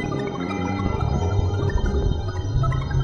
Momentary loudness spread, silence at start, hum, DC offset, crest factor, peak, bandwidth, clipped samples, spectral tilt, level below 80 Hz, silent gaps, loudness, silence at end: 4 LU; 0 s; none; under 0.1%; 16 dB; -6 dBFS; 7 kHz; under 0.1%; -7.5 dB/octave; -28 dBFS; none; -24 LUFS; 0 s